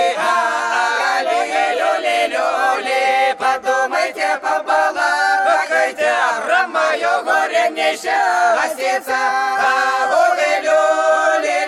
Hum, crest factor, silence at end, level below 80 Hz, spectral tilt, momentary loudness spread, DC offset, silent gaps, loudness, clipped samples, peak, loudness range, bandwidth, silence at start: none; 12 dB; 0 s; -66 dBFS; -0.5 dB/octave; 3 LU; under 0.1%; none; -16 LUFS; under 0.1%; -4 dBFS; 1 LU; 15 kHz; 0 s